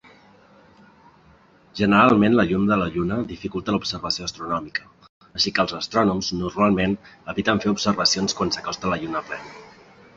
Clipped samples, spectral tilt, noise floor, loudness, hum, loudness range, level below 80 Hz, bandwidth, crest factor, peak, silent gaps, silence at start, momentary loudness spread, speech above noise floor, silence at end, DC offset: under 0.1%; -4.5 dB/octave; -54 dBFS; -22 LUFS; none; 4 LU; -50 dBFS; 7.8 kHz; 22 dB; -2 dBFS; 5.09-5.21 s; 1.75 s; 14 LU; 32 dB; 0.5 s; under 0.1%